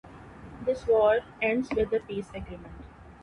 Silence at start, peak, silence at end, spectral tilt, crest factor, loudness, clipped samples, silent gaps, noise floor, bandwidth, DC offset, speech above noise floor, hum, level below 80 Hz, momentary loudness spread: 0.05 s; -12 dBFS; 0.1 s; -6.5 dB/octave; 18 dB; -27 LUFS; under 0.1%; none; -46 dBFS; 10.5 kHz; under 0.1%; 19 dB; none; -50 dBFS; 24 LU